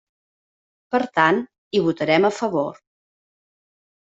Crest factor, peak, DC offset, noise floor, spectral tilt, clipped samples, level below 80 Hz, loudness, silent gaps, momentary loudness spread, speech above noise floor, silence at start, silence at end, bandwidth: 20 dB; -4 dBFS; under 0.1%; under -90 dBFS; -5.5 dB/octave; under 0.1%; -66 dBFS; -21 LUFS; 1.58-1.71 s; 7 LU; over 70 dB; 0.9 s; 1.3 s; 8 kHz